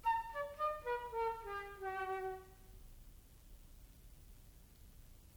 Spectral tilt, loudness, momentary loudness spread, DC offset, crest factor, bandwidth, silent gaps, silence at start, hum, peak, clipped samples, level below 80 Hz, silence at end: -4.5 dB/octave; -42 LUFS; 23 LU; under 0.1%; 16 dB; over 20 kHz; none; 0 s; none; -28 dBFS; under 0.1%; -60 dBFS; 0 s